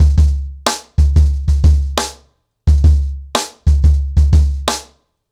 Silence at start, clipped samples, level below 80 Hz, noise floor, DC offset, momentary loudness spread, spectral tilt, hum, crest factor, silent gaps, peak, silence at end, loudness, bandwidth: 0 s; under 0.1%; -14 dBFS; -53 dBFS; under 0.1%; 8 LU; -5 dB/octave; none; 10 dB; none; -4 dBFS; 0.5 s; -15 LUFS; 12.5 kHz